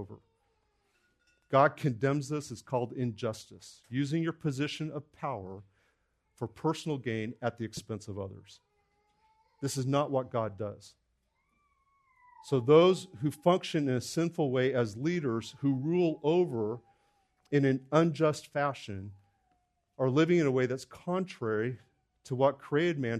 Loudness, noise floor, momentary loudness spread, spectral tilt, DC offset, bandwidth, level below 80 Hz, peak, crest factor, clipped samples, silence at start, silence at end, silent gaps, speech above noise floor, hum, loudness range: -31 LUFS; -77 dBFS; 15 LU; -6.5 dB/octave; under 0.1%; 13.5 kHz; -72 dBFS; -10 dBFS; 22 dB; under 0.1%; 0 s; 0 s; none; 46 dB; none; 9 LU